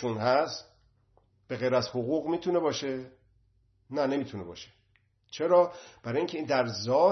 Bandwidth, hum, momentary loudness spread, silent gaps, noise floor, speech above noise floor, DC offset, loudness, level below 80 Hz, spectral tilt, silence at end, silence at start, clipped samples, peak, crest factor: 6.4 kHz; none; 17 LU; none; -69 dBFS; 41 dB; under 0.1%; -29 LUFS; -70 dBFS; -5.5 dB/octave; 0 s; 0 s; under 0.1%; -10 dBFS; 20 dB